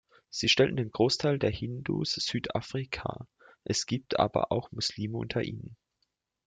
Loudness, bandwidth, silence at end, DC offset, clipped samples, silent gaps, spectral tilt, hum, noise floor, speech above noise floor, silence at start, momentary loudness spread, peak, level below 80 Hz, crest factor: -30 LUFS; 9.4 kHz; 0.75 s; under 0.1%; under 0.1%; none; -4.5 dB/octave; none; -80 dBFS; 49 dB; 0.35 s; 13 LU; -10 dBFS; -58 dBFS; 20 dB